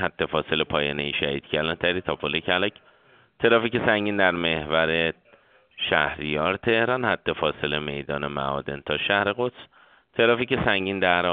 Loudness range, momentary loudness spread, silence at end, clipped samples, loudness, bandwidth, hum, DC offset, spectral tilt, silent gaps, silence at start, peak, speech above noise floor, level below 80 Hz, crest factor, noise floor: 2 LU; 8 LU; 0 s; under 0.1%; -24 LUFS; 4.7 kHz; none; under 0.1%; -2 dB/octave; none; 0 s; -2 dBFS; 33 dB; -52 dBFS; 22 dB; -57 dBFS